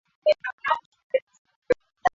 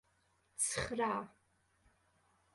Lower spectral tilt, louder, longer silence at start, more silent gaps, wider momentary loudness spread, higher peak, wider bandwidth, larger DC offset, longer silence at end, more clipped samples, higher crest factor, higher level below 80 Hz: first, -4 dB/octave vs -2.5 dB/octave; first, -27 LUFS vs -37 LUFS; second, 0.25 s vs 0.6 s; first, 0.53-0.58 s, 0.86-0.92 s, 1.03-1.10 s, 1.22-1.27 s, 1.38-1.45 s, 1.56-1.62 s vs none; second, 5 LU vs 16 LU; first, -8 dBFS vs -22 dBFS; second, 7.6 kHz vs 12 kHz; neither; second, 0.05 s vs 1.25 s; neither; about the same, 20 dB vs 20 dB; first, -60 dBFS vs -66 dBFS